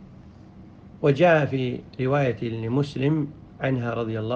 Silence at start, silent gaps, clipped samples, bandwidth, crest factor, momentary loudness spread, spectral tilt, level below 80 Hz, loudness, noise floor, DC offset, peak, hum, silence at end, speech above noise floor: 0 s; none; under 0.1%; 7.8 kHz; 18 dB; 11 LU; -8 dB/octave; -54 dBFS; -24 LUFS; -46 dBFS; under 0.1%; -6 dBFS; none; 0 s; 23 dB